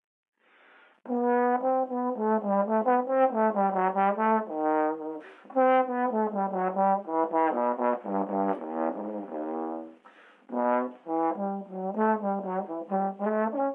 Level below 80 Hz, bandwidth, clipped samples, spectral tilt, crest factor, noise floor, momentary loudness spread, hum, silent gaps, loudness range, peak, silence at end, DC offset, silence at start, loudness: under -90 dBFS; 3.8 kHz; under 0.1%; -10 dB/octave; 16 dB; -59 dBFS; 10 LU; none; none; 6 LU; -12 dBFS; 0 s; under 0.1%; 1.05 s; -28 LUFS